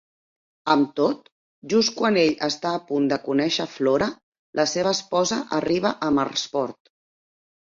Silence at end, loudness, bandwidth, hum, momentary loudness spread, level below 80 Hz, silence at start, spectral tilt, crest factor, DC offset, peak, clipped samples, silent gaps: 1 s; -23 LUFS; 7.8 kHz; none; 7 LU; -62 dBFS; 0.65 s; -4 dB/octave; 20 dB; under 0.1%; -4 dBFS; under 0.1%; 1.32-1.62 s, 4.23-4.32 s, 4.39-4.53 s